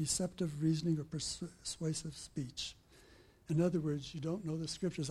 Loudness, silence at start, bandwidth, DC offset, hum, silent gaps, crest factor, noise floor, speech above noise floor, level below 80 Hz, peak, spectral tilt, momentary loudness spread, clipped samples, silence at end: -38 LUFS; 0 s; 13.5 kHz; under 0.1%; none; none; 18 dB; -63 dBFS; 25 dB; -62 dBFS; -20 dBFS; -5 dB/octave; 9 LU; under 0.1%; 0 s